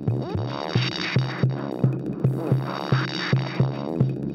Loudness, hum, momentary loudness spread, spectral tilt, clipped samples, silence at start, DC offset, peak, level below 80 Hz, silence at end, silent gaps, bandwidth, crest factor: -25 LUFS; none; 3 LU; -7.5 dB/octave; under 0.1%; 0 s; under 0.1%; -6 dBFS; -54 dBFS; 0 s; none; 6.8 kHz; 18 dB